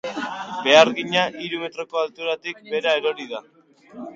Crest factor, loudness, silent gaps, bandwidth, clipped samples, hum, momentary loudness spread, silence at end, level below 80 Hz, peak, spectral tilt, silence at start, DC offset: 22 dB; -21 LUFS; none; 7.6 kHz; under 0.1%; none; 16 LU; 0 s; -70 dBFS; 0 dBFS; -3 dB/octave; 0.05 s; under 0.1%